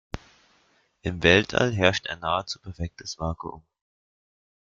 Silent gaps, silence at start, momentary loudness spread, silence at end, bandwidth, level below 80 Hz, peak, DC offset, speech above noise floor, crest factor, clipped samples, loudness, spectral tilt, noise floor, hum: none; 0.15 s; 18 LU; 1.15 s; 7.6 kHz; -48 dBFS; -2 dBFS; under 0.1%; 40 dB; 24 dB; under 0.1%; -25 LUFS; -4.5 dB/octave; -65 dBFS; none